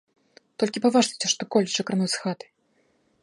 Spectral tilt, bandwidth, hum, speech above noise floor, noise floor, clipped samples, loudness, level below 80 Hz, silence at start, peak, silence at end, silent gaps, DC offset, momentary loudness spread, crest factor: -3.5 dB/octave; 11.5 kHz; none; 43 dB; -67 dBFS; under 0.1%; -24 LUFS; -74 dBFS; 0.6 s; -8 dBFS; 0.9 s; none; under 0.1%; 11 LU; 20 dB